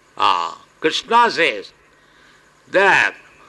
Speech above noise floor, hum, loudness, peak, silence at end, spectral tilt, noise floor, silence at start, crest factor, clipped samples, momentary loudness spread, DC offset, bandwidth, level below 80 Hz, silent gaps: 35 dB; none; -17 LUFS; -2 dBFS; 0.35 s; -2.5 dB/octave; -52 dBFS; 0.2 s; 16 dB; under 0.1%; 9 LU; under 0.1%; 12 kHz; -62 dBFS; none